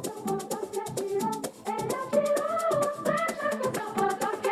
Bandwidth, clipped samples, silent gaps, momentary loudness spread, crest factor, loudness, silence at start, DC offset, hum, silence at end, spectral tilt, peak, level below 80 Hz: 14 kHz; under 0.1%; none; 7 LU; 16 dB; -29 LUFS; 0 s; under 0.1%; none; 0 s; -4.5 dB/octave; -14 dBFS; -68 dBFS